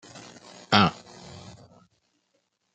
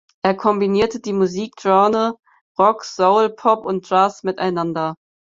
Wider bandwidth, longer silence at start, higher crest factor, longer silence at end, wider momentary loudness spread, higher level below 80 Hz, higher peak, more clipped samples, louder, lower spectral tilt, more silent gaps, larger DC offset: first, 9.2 kHz vs 7.8 kHz; about the same, 0.15 s vs 0.25 s; first, 28 dB vs 18 dB; first, 1.35 s vs 0.3 s; first, 25 LU vs 8 LU; second, -64 dBFS vs -58 dBFS; about the same, -2 dBFS vs 0 dBFS; neither; second, -22 LUFS vs -18 LUFS; about the same, -5 dB/octave vs -6 dB/octave; second, none vs 2.41-2.55 s; neither